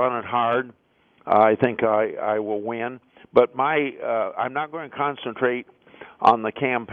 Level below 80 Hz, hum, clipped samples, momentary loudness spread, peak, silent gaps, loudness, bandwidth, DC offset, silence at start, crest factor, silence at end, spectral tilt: -66 dBFS; none; under 0.1%; 10 LU; -4 dBFS; none; -23 LUFS; 6.6 kHz; under 0.1%; 0 s; 20 dB; 0 s; -8 dB/octave